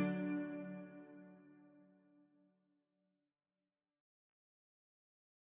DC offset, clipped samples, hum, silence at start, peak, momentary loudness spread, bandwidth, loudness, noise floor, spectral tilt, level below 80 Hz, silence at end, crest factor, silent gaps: under 0.1%; under 0.1%; none; 0 s; -26 dBFS; 24 LU; 3.8 kHz; -44 LUFS; under -90 dBFS; -7.5 dB/octave; under -90 dBFS; 3.7 s; 24 dB; none